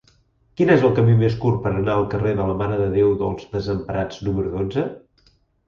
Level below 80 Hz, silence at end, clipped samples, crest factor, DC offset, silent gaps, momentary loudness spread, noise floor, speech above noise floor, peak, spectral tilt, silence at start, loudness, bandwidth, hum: -42 dBFS; 0.7 s; under 0.1%; 18 dB; under 0.1%; none; 10 LU; -59 dBFS; 40 dB; -2 dBFS; -9 dB/octave; 0.6 s; -20 LUFS; 7 kHz; none